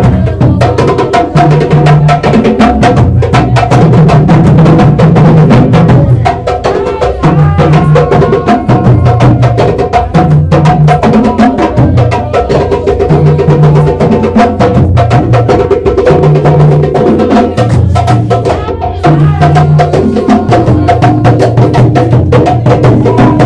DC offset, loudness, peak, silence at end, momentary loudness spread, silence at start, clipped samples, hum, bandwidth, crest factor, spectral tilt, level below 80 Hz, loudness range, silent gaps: under 0.1%; -6 LUFS; 0 dBFS; 0 s; 4 LU; 0 s; 5%; none; 9.8 kHz; 4 dB; -8.5 dB/octave; -22 dBFS; 2 LU; none